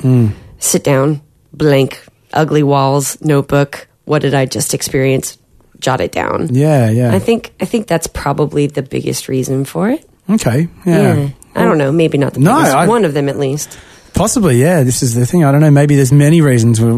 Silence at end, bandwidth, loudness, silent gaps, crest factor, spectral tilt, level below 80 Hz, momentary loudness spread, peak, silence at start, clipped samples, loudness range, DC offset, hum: 0 s; 14 kHz; -13 LUFS; none; 12 dB; -6 dB/octave; -40 dBFS; 9 LU; 0 dBFS; 0 s; under 0.1%; 4 LU; under 0.1%; none